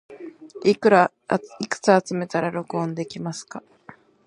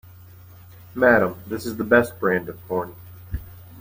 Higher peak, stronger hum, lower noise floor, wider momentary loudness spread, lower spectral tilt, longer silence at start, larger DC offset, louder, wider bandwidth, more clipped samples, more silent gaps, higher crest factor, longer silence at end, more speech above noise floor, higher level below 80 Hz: about the same, -2 dBFS vs -4 dBFS; neither; first, -49 dBFS vs -45 dBFS; first, 22 LU vs 19 LU; about the same, -5.5 dB/octave vs -6.5 dB/octave; second, 0.1 s vs 0.95 s; neither; about the same, -22 LUFS vs -21 LUFS; second, 11 kHz vs 16.5 kHz; neither; neither; about the same, 22 dB vs 20 dB; first, 0.35 s vs 0 s; about the same, 27 dB vs 24 dB; second, -70 dBFS vs -46 dBFS